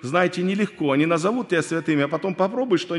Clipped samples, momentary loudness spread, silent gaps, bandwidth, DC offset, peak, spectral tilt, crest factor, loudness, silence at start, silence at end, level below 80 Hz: under 0.1%; 3 LU; none; 11.5 kHz; under 0.1%; -6 dBFS; -6 dB/octave; 16 dB; -22 LUFS; 0 s; 0 s; -70 dBFS